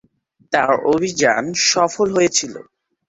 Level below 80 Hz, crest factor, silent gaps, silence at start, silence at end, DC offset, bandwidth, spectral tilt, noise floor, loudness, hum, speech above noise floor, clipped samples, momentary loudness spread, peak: -58 dBFS; 16 dB; none; 0.5 s; 0.45 s; under 0.1%; 8.2 kHz; -2.5 dB/octave; -59 dBFS; -17 LUFS; none; 42 dB; under 0.1%; 5 LU; -2 dBFS